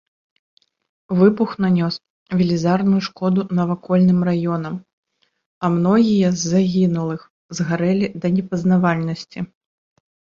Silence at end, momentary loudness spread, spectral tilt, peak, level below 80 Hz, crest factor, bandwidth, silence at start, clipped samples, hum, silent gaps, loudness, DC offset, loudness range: 0.8 s; 13 LU; -7 dB/octave; -2 dBFS; -56 dBFS; 16 dB; 7.4 kHz; 1.1 s; under 0.1%; none; 2.10-2.26 s, 4.93-5.03 s, 5.46-5.61 s, 7.30-7.49 s; -19 LUFS; under 0.1%; 2 LU